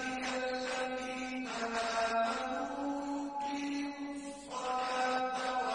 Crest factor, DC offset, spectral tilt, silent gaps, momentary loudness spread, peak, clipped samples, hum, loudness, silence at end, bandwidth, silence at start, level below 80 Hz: 14 dB; under 0.1%; -2.5 dB/octave; none; 7 LU; -22 dBFS; under 0.1%; none; -36 LUFS; 0 s; 10.5 kHz; 0 s; -66 dBFS